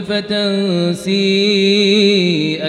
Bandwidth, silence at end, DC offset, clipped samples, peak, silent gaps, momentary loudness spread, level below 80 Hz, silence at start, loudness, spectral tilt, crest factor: 12 kHz; 0 s; under 0.1%; under 0.1%; 0 dBFS; none; 6 LU; -58 dBFS; 0 s; -13 LUFS; -5 dB/octave; 14 dB